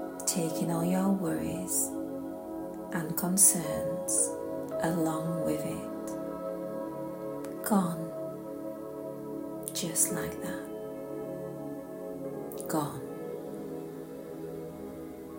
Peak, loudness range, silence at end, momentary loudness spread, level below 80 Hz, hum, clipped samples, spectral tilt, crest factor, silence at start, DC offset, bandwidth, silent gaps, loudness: -8 dBFS; 10 LU; 0 s; 13 LU; -64 dBFS; none; under 0.1%; -4.5 dB/octave; 24 dB; 0 s; under 0.1%; 16.5 kHz; none; -32 LUFS